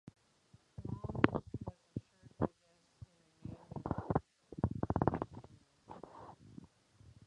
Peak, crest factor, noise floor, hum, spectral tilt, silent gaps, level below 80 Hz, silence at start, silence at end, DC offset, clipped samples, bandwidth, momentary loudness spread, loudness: -8 dBFS; 34 dB; -72 dBFS; none; -8.5 dB/octave; none; -56 dBFS; 0.05 s; 0.15 s; under 0.1%; under 0.1%; 10 kHz; 23 LU; -40 LUFS